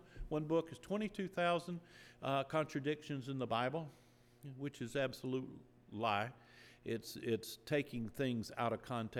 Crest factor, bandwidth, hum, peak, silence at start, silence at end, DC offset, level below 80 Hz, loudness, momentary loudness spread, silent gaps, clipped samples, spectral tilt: 18 dB; 19.5 kHz; none; -22 dBFS; 0 s; 0 s; under 0.1%; -64 dBFS; -41 LUFS; 15 LU; none; under 0.1%; -6 dB/octave